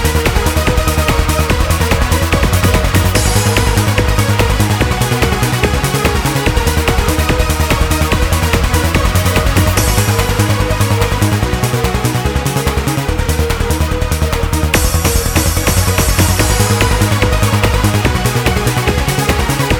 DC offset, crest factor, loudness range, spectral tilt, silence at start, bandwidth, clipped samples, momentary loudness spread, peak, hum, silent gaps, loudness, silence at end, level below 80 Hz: under 0.1%; 12 dB; 2 LU; -4.5 dB/octave; 0 s; 20 kHz; under 0.1%; 3 LU; 0 dBFS; none; none; -13 LUFS; 0 s; -18 dBFS